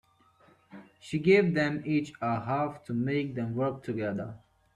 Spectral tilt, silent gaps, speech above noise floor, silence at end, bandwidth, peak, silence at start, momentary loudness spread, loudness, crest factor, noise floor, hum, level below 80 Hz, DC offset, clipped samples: -7.5 dB/octave; none; 34 dB; 0.4 s; 10.5 kHz; -10 dBFS; 0.7 s; 12 LU; -29 LUFS; 20 dB; -62 dBFS; none; -66 dBFS; under 0.1%; under 0.1%